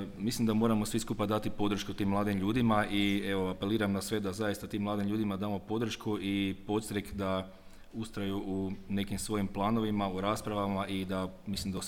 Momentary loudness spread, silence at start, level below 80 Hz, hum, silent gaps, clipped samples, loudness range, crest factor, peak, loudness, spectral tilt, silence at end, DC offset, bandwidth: 7 LU; 0 s; -52 dBFS; none; none; under 0.1%; 4 LU; 18 dB; -14 dBFS; -33 LUFS; -5.5 dB/octave; 0 s; under 0.1%; 17 kHz